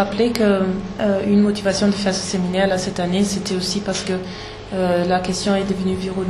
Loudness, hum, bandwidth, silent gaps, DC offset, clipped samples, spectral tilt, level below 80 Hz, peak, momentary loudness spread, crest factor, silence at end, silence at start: -19 LUFS; none; 12.5 kHz; none; under 0.1%; under 0.1%; -5 dB/octave; -42 dBFS; -2 dBFS; 6 LU; 18 dB; 0 s; 0 s